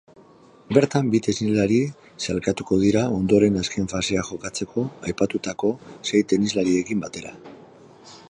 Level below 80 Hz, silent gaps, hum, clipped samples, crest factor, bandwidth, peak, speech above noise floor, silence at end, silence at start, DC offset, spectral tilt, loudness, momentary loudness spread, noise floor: -50 dBFS; none; none; under 0.1%; 20 dB; 10.5 kHz; -2 dBFS; 29 dB; 0.15 s; 0.7 s; under 0.1%; -5.5 dB/octave; -22 LUFS; 10 LU; -51 dBFS